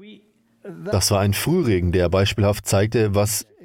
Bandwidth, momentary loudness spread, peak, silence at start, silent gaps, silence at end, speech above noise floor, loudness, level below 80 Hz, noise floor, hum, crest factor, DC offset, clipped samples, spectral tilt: 17 kHz; 5 LU; -8 dBFS; 0 s; none; 0.25 s; 35 dB; -20 LUFS; -42 dBFS; -54 dBFS; none; 12 dB; under 0.1%; under 0.1%; -5 dB/octave